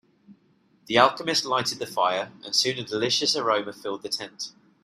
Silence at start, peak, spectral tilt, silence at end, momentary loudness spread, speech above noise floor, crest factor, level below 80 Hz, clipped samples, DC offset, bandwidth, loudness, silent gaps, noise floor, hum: 0.3 s; -2 dBFS; -2.5 dB/octave; 0.35 s; 13 LU; 38 dB; 26 dB; -70 dBFS; under 0.1%; under 0.1%; 15.5 kHz; -24 LUFS; none; -63 dBFS; none